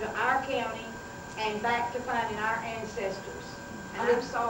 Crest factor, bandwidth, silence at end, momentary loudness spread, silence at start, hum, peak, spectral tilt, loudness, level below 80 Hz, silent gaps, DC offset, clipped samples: 18 dB; 19 kHz; 0 s; 13 LU; 0 s; none; -14 dBFS; -4 dB/octave; -32 LUFS; -58 dBFS; none; under 0.1%; under 0.1%